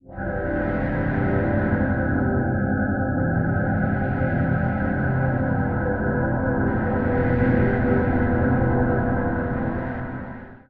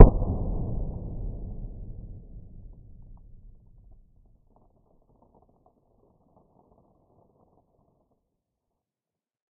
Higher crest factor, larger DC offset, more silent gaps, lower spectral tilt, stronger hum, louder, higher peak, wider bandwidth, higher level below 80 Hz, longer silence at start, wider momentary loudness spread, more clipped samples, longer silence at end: second, 14 dB vs 26 dB; first, 0.3% vs under 0.1%; neither; first, -12 dB/octave vs -6.5 dB/octave; neither; first, -23 LUFS vs -30 LUFS; second, -8 dBFS vs 0 dBFS; first, 4.2 kHz vs 1.5 kHz; about the same, -34 dBFS vs -32 dBFS; about the same, 0.05 s vs 0 s; second, 5 LU vs 22 LU; neither; second, 0.1 s vs 7.2 s